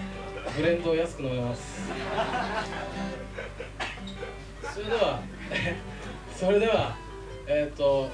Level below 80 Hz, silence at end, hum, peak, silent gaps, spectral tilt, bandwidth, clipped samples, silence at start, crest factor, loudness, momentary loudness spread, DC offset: -44 dBFS; 0 s; 50 Hz at -45 dBFS; -10 dBFS; none; -5.5 dB/octave; 11 kHz; under 0.1%; 0 s; 18 dB; -30 LUFS; 14 LU; under 0.1%